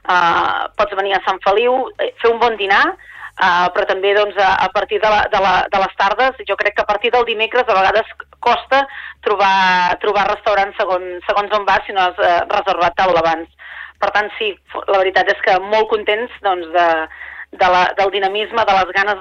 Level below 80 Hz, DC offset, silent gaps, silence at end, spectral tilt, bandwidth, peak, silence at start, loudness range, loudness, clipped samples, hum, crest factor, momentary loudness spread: -46 dBFS; under 0.1%; none; 0 s; -3.5 dB/octave; 7.2 kHz; -2 dBFS; 0.05 s; 2 LU; -15 LUFS; under 0.1%; none; 14 dB; 7 LU